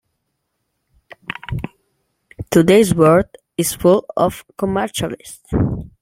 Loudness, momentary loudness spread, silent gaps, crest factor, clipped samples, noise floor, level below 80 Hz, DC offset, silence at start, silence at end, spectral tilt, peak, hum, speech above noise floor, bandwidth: -17 LUFS; 18 LU; none; 16 dB; under 0.1%; -72 dBFS; -40 dBFS; under 0.1%; 1.5 s; 0.15 s; -5.5 dB/octave; -2 dBFS; none; 57 dB; 16.5 kHz